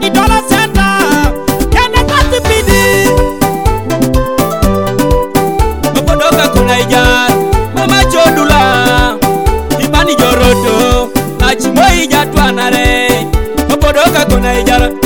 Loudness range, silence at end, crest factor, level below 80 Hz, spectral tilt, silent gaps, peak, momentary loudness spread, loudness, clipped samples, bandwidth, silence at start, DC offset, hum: 2 LU; 0 s; 10 dB; -16 dBFS; -4.5 dB/octave; none; 0 dBFS; 5 LU; -9 LUFS; 0.2%; 18 kHz; 0 s; 3%; none